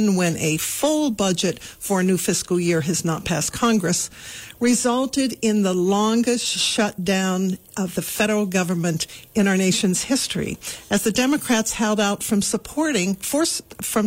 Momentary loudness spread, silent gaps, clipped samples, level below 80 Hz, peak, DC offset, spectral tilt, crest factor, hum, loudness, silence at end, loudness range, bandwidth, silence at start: 6 LU; none; under 0.1%; -52 dBFS; -8 dBFS; under 0.1%; -4 dB/octave; 14 dB; none; -21 LUFS; 0 s; 1 LU; 16.5 kHz; 0 s